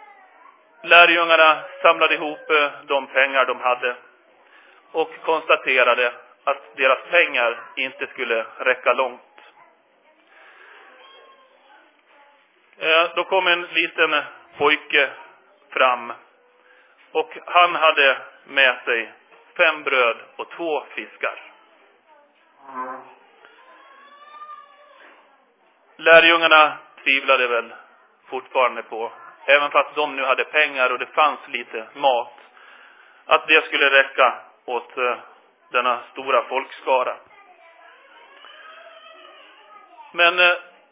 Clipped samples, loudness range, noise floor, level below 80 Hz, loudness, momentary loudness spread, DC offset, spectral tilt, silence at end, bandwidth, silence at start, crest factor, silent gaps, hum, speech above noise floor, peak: under 0.1%; 13 LU; -59 dBFS; -78 dBFS; -18 LUFS; 17 LU; under 0.1%; -5 dB/octave; 0.3 s; 3.9 kHz; 0.85 s; 22 dB; none; none; 40 dB; 0 dBFS